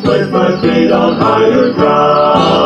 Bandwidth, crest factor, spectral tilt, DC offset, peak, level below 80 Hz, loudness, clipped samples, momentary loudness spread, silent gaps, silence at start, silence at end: 9 kHz; 10 dB; -7 dB/octave; under 0.1%; 0 dBFS; -42 dBFS; -10 LUFS; under 0.1%; 3 LU; none; 0 s; 0 s